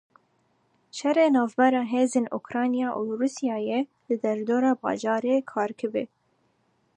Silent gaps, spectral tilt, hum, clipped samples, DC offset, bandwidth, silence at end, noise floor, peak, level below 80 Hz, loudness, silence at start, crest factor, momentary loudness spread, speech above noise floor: none; -5 dB/octave; none; under 0.1%; under 0.1%; 10 kHz; 0.9 s; -69 dBFS; -8 dBFS; -78 dBFS; -25 LUFS; 0.95 s; 18 dB; 9 LU; 44 dB